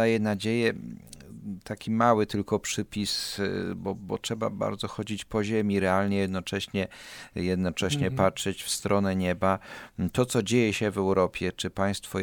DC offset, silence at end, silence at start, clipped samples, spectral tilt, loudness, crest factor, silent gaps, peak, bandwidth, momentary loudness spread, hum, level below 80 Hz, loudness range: under 0.1%; 0 s; 0 s; under 0.1%; -5 dB/octave; -28 LUFS; 20 dB; none; -8 dBFS; 19 kHz; 11 LU; none; -56 dBFS; 2 LU